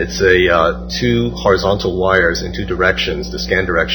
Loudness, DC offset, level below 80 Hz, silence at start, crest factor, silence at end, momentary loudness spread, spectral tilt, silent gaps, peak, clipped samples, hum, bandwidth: -15 LUFS; under 0.1%; -30 dBFS; 0 s; 14 dB; 0 s; 8 LU; -5 dB/octave; none; 0 dBFS; under 0.1%; none; over 20 kHz